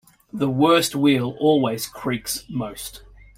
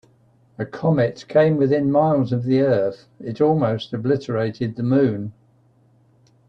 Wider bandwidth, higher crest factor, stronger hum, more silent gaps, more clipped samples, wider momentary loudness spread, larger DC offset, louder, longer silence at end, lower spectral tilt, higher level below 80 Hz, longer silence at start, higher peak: first, 16.5 kHz vs 7.4 kHz; about the same, 18 dB vs 16 dB; neither; neither; neither; about the same, 15 LU vs 13 LU; neither; about the same, -21 LUFS vs -20 LUFS; second, 0.4 s vs 1.2 s; second, -5 dB/octave vs -9 dB/octave; first, -52 dBFS vs -58 dBFS; second, 0.35 s vs 0.6 s; about the same, -4 dBFS vs -4 dBFS